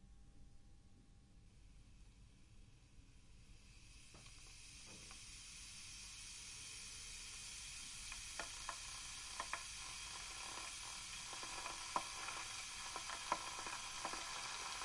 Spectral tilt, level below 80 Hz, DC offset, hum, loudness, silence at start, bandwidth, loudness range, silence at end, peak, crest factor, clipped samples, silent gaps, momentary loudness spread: -0.5 dB/octave; -64 dBFS; under 0.1%; none; -48 LUFS; 0 s; 11.5 kHz; 19 LU; 0 s; -24 dBFS; 28 dB; under 0.1%; none; 22 LU